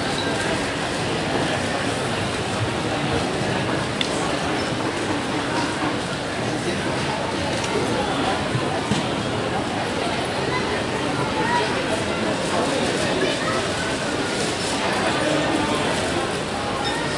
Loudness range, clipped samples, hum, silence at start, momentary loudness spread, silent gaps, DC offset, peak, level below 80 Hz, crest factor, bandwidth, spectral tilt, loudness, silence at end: 2 LU; under 0.1%; none; 0 s; 3 LU; none; under 0.1%; -2 dBFS; -46 dBFS; 20 dB; 11.5 kHz; -4 dB/octave; -23 LUFS; 0 s